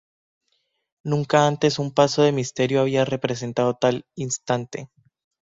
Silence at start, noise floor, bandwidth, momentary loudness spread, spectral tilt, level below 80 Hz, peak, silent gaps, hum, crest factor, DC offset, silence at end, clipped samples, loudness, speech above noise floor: 1.05 s; -72 dBFS; 7.8 kHz; 10 LU; -5 dB/octave; -60 dBFS; -4 dBFS; none; none; 20 dB; under 0.1%; 0.65 s; under 0.1%; -22 LUFS; 50 dB